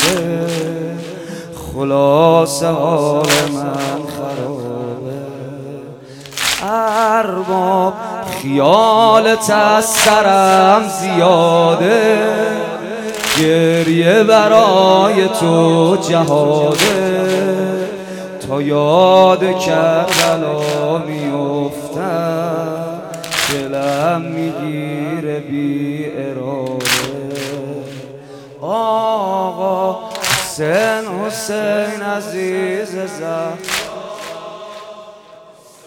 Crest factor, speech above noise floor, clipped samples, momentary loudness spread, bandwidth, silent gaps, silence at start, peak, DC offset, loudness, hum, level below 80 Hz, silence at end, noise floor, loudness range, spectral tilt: 14 dB; 28 dB; under 0.1%; 17 LU; 19.5 kHz; none; 0 s; 0 dBFS; under 0.1%; -14 LUFS; none; -52 dBFS; 0.45 s; -41 dBFS; 9 LU; -4.5 dB/octave